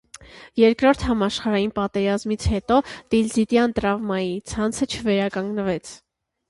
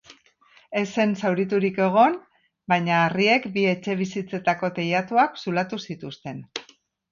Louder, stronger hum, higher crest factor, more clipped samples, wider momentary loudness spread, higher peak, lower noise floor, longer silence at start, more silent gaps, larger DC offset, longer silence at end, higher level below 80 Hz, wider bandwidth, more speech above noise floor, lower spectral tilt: about the same, -22 LUFS vs -23 LUFS; neither; about the same, 16 dB vs 18 dB; neither; second, 7 LU vs 15 LU; about the same, -4 dBFS vs -6 dBFS; second, -45 dBFS vs -57 dBFS; about the same, 0.2 s vs 0.1 s; neither; neither; about the same, 0.55 s vs 0.5 s; first, -40 dBFS vs -68 dBFS; first, 11.5 kHz vs 7.4 kHz; second, 23 dB vs 35 dB; about the same, -5.5 dB/octave vs -6 dB/octave